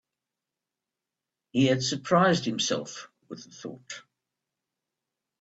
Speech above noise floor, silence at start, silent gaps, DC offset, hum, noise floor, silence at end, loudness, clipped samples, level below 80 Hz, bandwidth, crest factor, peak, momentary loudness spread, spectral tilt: 61 dB; 1.55 s; none; under 0.1%; none; -88 dBFS; 1.4 s; -25 LUFS; under 0.1%; -70 dBFS; 8 kHz; 22 dB; -10 dBFS; 21 LU; -4.5 dB/octave